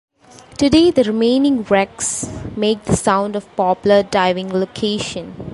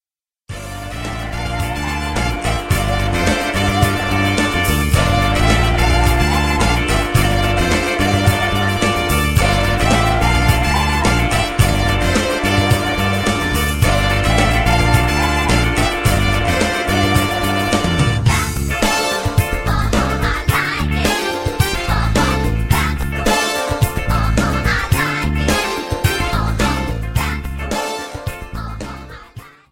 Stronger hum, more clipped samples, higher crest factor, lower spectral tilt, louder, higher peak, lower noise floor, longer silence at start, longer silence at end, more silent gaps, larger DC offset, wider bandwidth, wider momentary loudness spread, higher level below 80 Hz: neither; neither; about the same, 16 dB vs 16 dB; about the same, -4.5 dB/octave vs -4.5 dB/octave; about the same, -17 LUFS vs -16 LUFS; about the same, -2 dBFS vs 0 dBFS; second, -43 dBFS vs -49 dBFS; about the same, 0.55 s vs 0.5 s; second, 0 s vs 0.25 s; neither; neither; second, 11.5 kHz vs 16.5 kHz; first, 10 LU vs 7 LU; second, -42 dBFS vs -22 dBFS